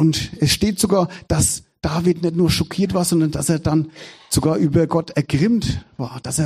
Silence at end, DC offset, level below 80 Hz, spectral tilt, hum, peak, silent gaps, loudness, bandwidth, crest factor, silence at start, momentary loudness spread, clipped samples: 0 s; under 0.1%; -38 dBFS; -5 dB/octave; none; -2 dBFS; none; -19 LUFS; 15 kHz; 16 dB; 0 s; 7 LU; under 0.1%